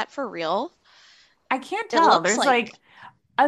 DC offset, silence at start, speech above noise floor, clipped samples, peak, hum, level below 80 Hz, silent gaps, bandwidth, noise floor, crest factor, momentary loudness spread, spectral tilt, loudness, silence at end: under 0.1%; 0 s; 33 dB; under 0.1%; -4 dBFS; none; -72 dBFS; none; 12.5 kHz; -56 dBFS; 20 dB; 12 LU; -2.5 dB/octave; -22 LUFS; 0 s